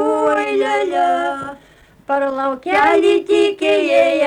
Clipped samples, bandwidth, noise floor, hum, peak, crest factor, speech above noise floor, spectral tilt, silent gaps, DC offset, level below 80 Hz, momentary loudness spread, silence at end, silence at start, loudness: under 0.1%; 11.5 kHz; -48 dBFS; none; -4 dBFS; 12 dB; 33 dB; -3.5 dB/octave; none; under 0.1%; -56 dBFS; 8 LU; 0 s; 0 s; -16 LUFS